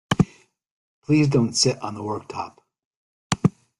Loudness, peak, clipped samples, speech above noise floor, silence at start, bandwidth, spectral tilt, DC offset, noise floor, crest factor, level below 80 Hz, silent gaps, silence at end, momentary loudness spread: -22 LUFS; -2 dBFS; under 0.1%; 24 dB; 0.1 s; 12 kHz; -5 dB/octave; under 0.1%; -46 dBFS; 22 dB; -52 dBFS; 0.71-1.02 s, 2.85-3.30 s; 0.3 s; 15 LU